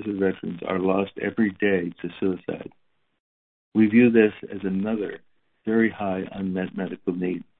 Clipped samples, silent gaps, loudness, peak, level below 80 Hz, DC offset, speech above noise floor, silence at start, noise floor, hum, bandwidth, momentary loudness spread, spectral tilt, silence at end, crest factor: under 0.1%; 3.20-3.72 s; -24 LUFS; -4 dBFS; -62 dBFS; under 0.1%; over 66 dB; 0 s; under -90 dBFS; none; 4 kHz; 14 LU; -11.5 dB/octave; 0.15 s; 20 dB